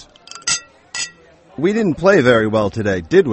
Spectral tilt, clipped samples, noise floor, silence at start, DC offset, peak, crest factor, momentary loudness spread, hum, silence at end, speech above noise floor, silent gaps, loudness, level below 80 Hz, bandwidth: -4.5 dB/octave; under 0.1%; -44 dBFS; 0.35 s; under 0.1%; 0 dBFS; 16 dB; 15 LU; none; 0 s; 30 dB; none; -17 LUFS; -48 dBFS; 8.8 kHz